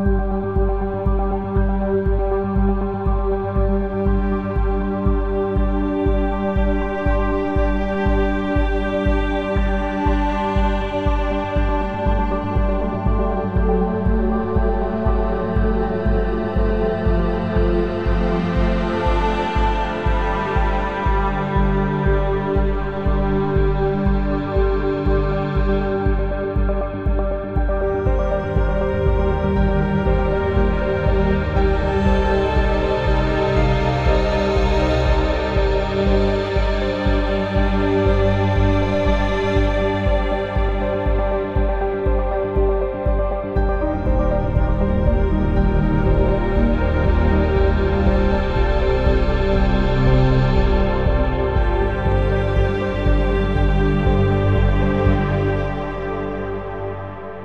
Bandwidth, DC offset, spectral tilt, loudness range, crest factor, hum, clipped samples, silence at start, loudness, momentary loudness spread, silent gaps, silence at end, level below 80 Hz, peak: 6.8 kHz; under 0.1%; -8.5 dB/octave; 3 LU; 14 dB; none; under 0.1%; 0 s; -20 LUFS; 4 LU; none; 0 s; -22 dBFS; -4 dBFS